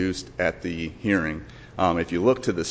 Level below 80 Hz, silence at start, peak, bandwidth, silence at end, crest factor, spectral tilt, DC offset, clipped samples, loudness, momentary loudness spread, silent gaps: -44 dBFS; 0 s; -8 dBFS; 8 kHz; 0 s; 18 dB; -5.5 dB/octave; under 0.1%; under 0.1%; -25 LUFS; 9 LU; none